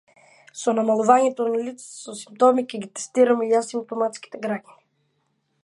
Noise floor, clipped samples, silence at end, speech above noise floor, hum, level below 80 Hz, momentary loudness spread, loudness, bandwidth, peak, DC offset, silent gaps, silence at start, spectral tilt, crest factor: -71 dBFS; under 0.1%; 1.05 s; 49 dB; none; -80 dBFS; 17 LU; -22 LUFS; 11.5 kHz; -4 dBFS; under 0.1%; none; 0.55 s; -4.5 dB/octave; 20 dB